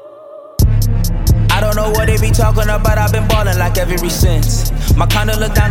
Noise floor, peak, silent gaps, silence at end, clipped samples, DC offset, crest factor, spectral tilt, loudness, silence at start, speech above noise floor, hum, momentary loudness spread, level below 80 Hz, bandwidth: -34 dBFS; 0 dBFS; none; 0 s; under 0.1%; under 0.1%; 12 dB; -5 dB/octave; -14 LUFS; 0 s; 23 dB; none; 4 LU; -16 dBFS; 17 kHz